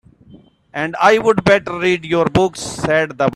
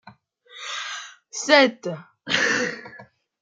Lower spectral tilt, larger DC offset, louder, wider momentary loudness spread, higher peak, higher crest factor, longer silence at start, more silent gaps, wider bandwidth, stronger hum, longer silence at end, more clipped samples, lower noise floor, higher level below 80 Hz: first, -5 dB/octave vs -2.5 dB/octave; neither; first, -15 LUFS vs -21 LUFS; second, 10 LU vs 20 LU; about the same, 0 dBFS vs -2 dBFS; second, 16 dB vs 22 dB; first, 0.35 s vs 0.05 s; neither; first, 13 kHz vs 9.4 kHz; neither; second, 0 s vs 0.4 s; neither; second, -45 dBFS vs -51 dBFS; first, -44 dBFS vs -74 dBFS